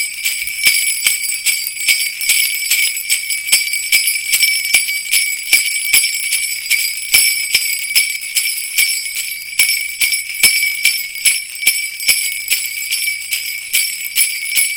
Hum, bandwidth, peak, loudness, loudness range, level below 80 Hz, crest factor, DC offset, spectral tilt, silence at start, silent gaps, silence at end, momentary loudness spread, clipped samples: none; over 20 kHz; 0 dBFS; -13 LUFS; 2 LU; -56 dBFS; 16 dB; under 0.1%; 4 dB/octave; 0 s; none; 0 s; 5 LU; under 0.1%